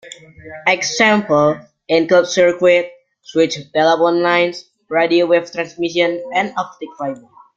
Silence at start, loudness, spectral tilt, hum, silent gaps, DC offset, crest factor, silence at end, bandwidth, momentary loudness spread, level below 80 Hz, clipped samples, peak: 0.05 s; -16 LUFS; -4 dB/octave; none; none; under 0.1%; 16 dB; 0.4 s; 7.8 kHz; 13 LU; -60 dBFS; under 0.1%; 0 dBFS